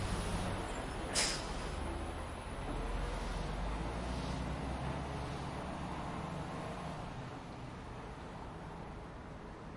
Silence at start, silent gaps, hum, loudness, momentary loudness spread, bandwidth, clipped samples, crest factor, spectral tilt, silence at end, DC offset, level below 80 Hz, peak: 0 s; none; none; -41 LUFS; 10 LU; 11.5 kHz; under 0.1%; 22 dB; -4 dB/octave; 0 s; under 0.1%; -46 dBFS; -20 dBFS